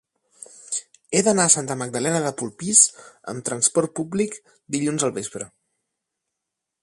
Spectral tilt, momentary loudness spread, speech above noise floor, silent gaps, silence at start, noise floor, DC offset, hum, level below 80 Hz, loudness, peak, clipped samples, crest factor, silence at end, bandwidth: -3 dB/octave; 19 LU; 61 dB; none; 0.6 s; -83 dBFS; under 0.1%; none; -66 dBFS; -21 LUFS; 0 dBFS; under 0.1%; 24 dB; 1.35 s; 11.5 kHz